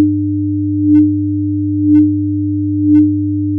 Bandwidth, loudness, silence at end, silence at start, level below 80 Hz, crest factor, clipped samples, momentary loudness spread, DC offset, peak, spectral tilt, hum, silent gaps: 2.2 kHz; -13 LUFS; 0 s; 0 s; -54 dBFS; 10 dB; under 0.1%; 6 LU; under 0.1%; -2 dBFS; -13.5 dB/octave; none; none